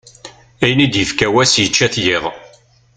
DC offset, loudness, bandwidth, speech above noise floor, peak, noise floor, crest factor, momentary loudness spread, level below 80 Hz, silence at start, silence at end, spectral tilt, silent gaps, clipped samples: under 0.1%; -13 LUFS; 9.4 kHz; 33 dB; 0 dBFS; -48 dBFS; 16 dB; 7 LU; -46 dBFS; 0.25 s; 0.5 s; -3.5 dB/octave; none; under 0.1%